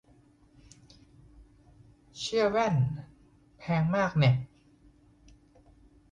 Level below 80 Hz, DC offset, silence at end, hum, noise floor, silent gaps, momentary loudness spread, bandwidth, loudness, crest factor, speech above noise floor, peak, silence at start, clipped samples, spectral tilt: -58 dBFS; under 0.1%; 1.65 s; none; -61 dBFS; none; 19 LU; 9.6 kHz; -28 LUFS; 18 dB; 35 dB; -14 dBFS; 2.15 s; under 0.1%; -6.5 dB/octave